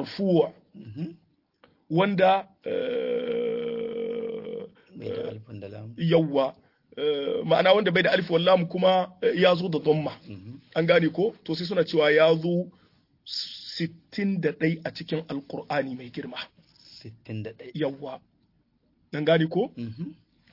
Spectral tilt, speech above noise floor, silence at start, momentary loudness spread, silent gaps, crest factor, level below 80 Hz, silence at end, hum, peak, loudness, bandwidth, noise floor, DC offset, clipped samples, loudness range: -7.5 dB/octave; 43 dB; 0 s; 18 LU; none; 20 dB; -70 dBFS; 0.4 s; none; -6 dBFS; -25 LUFS; 5.8 kHz; -68 dBFS; under 0.1%; under 0.1%; 10 LU